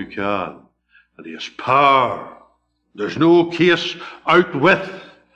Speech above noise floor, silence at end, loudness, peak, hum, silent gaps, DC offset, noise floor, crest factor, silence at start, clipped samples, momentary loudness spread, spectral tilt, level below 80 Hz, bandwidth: 44 dB; 0.3 s; -17 LUFS; -2 dBFS; 60 Hz at -55 dBFS; none; under 0.1%; -61 dBFS; 16 dB; 0 s; under 0.1%; 17 LU; -6 dB/octave; -56 dBFS; 7.8 kHz